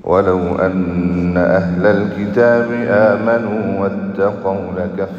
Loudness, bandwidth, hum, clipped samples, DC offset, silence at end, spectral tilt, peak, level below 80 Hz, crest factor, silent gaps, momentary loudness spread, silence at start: -15 LUFS; 7.2 kHz; none; under 0.1%; under 0.1%; 0 s; -9 dB/octave; 0 dBFS; -48 dBFS; 14 dB; none; 7 LU; 0.05 s